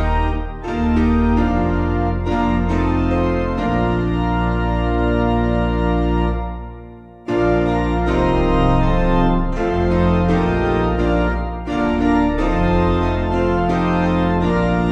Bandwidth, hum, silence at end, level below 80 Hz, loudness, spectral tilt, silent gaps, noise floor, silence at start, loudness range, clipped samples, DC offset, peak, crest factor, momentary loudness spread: 8 kHz; none; 0 s; -24 dBFS; -18 LUFS; -8.5 dB/octave; none; -38 dBFS; 0 s; 2 LU; under 0.1%; under 0.1%; -2 dBFS; 14 dB; 5 LU